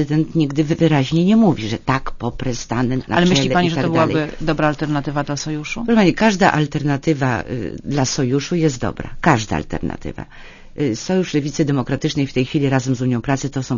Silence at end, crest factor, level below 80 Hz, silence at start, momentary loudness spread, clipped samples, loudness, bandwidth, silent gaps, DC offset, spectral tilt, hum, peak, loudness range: 0 s; 18 dB; -36 dBFS; 0 s; 10 LU; under 0.1%; -18 LUFS; 7.4 kHz; none; under 0.1%; -6 dB/octave; none; 0 dBFS; 4 LU